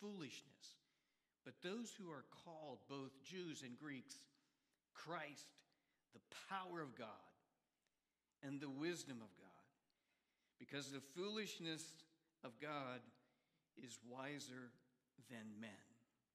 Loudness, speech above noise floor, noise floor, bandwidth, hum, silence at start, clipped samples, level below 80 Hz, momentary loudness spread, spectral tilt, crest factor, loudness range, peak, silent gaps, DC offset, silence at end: -53 LUFS; over 37 dB; under -90 dBFS; 15 kHz; none; 0 s; under 0.1%; under -90 dBFS; 16 LU; -4 dB/octave; 22 dB; 4 LU; -34 dBFS; none; under 0.1%; 0.35 s